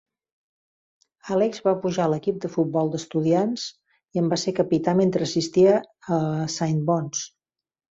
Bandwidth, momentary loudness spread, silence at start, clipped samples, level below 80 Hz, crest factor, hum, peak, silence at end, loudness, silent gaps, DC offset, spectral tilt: 8 kHz; 8 LU; 1.25 s; under 0.1%; -64 dBFS; 16 dB; none; -6 dBFS; 0.65 s; -23 LUFS; none; under 0.1%; -6 dB/octave